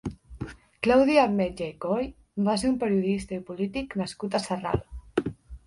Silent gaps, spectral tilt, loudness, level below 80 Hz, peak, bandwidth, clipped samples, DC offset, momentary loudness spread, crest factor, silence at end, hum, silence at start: none; -6 dB/octave; -27 LUFS; -48 dBFS; -6 dBFS; 11.5 kHz; under 0.1%; under 0.1%; 16 LU; 20 dB; 0.1 s; none; 0.05 s